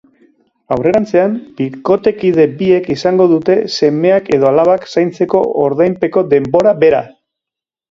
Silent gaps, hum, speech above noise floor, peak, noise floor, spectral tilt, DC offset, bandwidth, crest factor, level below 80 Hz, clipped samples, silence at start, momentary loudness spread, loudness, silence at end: none; none; 74 dB; 0 dBFS; -85 dBFS; -7 dB/octave; under 0.1%; 7.6 kHz; 12 dB; -50 dBFS; under 0.1%; 0.7 s; 6 LU; -12 LUFS; 0.8 s